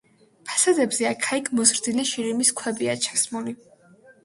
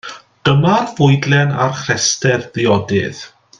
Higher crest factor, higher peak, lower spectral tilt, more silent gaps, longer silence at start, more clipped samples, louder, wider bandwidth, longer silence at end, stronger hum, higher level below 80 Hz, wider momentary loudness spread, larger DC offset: first, 22 dB vs 14 dB; second, -4 dBFS vs 0 dBFS; second, -2 dB/octave vs -4.5 dB/octave; neither; first, 0.45 s vs 0.05 s; neither; second, -22 LUFS vs -15 LUFS; first, 11.5 kHz vs 9.4 kHz; first, 0.7 s vs 0.35 s; neither; second, -70 dBFS vs -50 dBFS; first, 11 LU vs 7 LU; neither